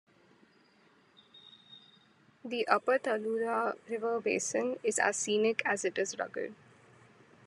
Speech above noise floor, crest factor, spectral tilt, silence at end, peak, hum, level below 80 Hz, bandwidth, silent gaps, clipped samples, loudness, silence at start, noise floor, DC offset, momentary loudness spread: 33 dB; 24 dB; -2.5 dB/octave; 0.9 s; -10 dBFS; none; -88 dBFS; 12 kHz; none; under 0.1%; -32 LUFS; 1.35 s; -65 dBFS; under 0.1%; 11 LU